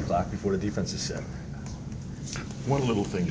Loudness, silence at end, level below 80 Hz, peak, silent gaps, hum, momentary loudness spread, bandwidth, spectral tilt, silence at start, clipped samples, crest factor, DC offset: -31 LUFS; 0 s; -44 dBFS; -12 dBFS; none; none; 11 LU; 8 kHz; -5.5 dB/octave; 0 s; under 0.1%; 16 dB; under 0.1%